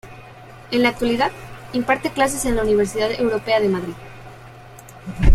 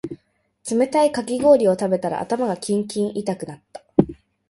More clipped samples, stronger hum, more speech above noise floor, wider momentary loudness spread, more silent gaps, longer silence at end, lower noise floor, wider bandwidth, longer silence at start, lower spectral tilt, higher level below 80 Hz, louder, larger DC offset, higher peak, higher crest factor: neither; neither; second, 23 dB vs 42 dB; first, 22 LU vs 19 LU; neither; second, 0 s vs 0.35 s; second, -41 dBFS vs -62 dBFS; first, 15.5 kHz vs 11.5 kHz; about the same, 0.05 s vs 0.05 s; about the same, -5 dB/octave vs -6 dB/octave; first, -28 dBFS vs -54 dBFS; about the same, -20 LUFS vs -21 LUFS; neither; about the same, -2 dBFS vs 0 dBFS; about the same, 18 dB vs 20 dB